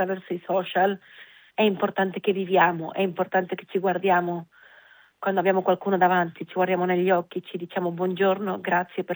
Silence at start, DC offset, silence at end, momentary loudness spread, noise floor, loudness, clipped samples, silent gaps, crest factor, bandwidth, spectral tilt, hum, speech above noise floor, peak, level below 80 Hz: 0 s; under 0.1%; 0 s; 10 LU; -54 dBFS; -24 LUFS; under 0.1%; none; 18 dB; over 20 kHz; -8.5 dB/octave; none; 30 dB; -6 dBFS; -82 dBFS